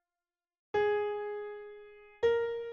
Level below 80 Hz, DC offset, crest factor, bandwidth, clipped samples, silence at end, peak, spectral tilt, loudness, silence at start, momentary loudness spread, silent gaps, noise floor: -68 dBFS; under 0.1%; 16 dB; 6.8 kHz; under 0.1%; 0 s; -18 dBFS; -5 dB/octave; -33 LUFS; 0.75 s; 17 LU; none; under -90 dBFS